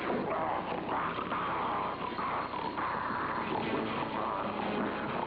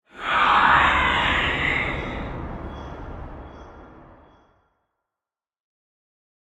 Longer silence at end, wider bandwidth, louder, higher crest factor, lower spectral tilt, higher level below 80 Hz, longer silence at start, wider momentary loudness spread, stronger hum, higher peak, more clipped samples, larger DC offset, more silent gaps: second, 0 s vs 2.45 s; second, 5.4 kHz vs 11 kHz; second, -34 LUFS vs -19 LUFS; second, 14 dB vs 20 dB; first, -8.5 dB/octave vs -4.5 dB/octave; second, -60 dBFS vs -40 dBFS; second, 0 s vs 0.15 s; second, 2 LU vs 22 LU; neither; second, -20 dBFS vs -4 dBFS; neither; neither; neither